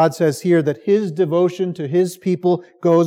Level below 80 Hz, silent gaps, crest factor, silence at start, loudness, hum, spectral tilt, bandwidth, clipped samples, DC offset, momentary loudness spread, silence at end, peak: -78 dBFS; none; 14 dB; 0 s; -18 LUFS; none; -7 dB/octave; 15.5 kHz; under 0.1%; under 0.1%; 3 LU; 0 s; -4 dBFS